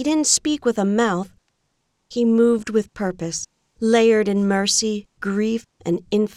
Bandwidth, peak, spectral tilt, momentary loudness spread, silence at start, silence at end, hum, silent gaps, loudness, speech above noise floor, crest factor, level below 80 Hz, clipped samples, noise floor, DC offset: 14 kHz; -4 dBFS; -4 dB/octave; 11 LU; 0 s; 0.1 s; none; none; -20 LUFS; 51 dB; 16 dB; -56 dBFS; under 0.1%; -71 dBFS; under 0.1%